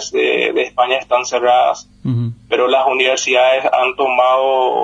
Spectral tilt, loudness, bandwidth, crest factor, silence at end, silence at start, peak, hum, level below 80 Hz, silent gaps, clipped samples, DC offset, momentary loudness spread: -4 dB/octave; -14 LUFS; 8.2 kHz; 14 dB; 0 s; 0 s; 0 dBFS; 50 Hz at -50 dBFS; -58 dBFS; none; under 0.1%; under 0.1%; 7 LU